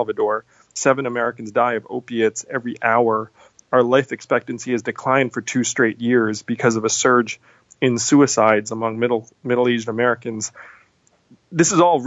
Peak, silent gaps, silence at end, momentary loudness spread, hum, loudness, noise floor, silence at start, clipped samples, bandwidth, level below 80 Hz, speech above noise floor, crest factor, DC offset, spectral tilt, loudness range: -2 dBFS; none; 0 s; 11 LU; none; -19 LUFS; -59 dBFS; 0 s; under 0.1%; 8 kHz; -66 dBFS; 40 dB; 18 dB; under 0.1%; -4 dB/octave; 3 LU